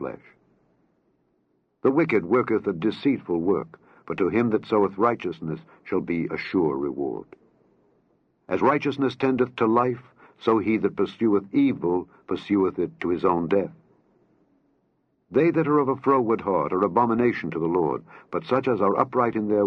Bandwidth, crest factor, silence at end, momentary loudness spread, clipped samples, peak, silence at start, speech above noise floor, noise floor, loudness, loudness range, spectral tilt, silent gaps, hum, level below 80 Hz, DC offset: 6.4 kHz; 20 dB; 0 s; 10 LU; under 0.1%; -4 dBFS; 0 s; 46 dB; -70 dBFS; -24 LUFS; 4 LU; -9 dB/octave; none; none; -64 dBFS; under 0.1%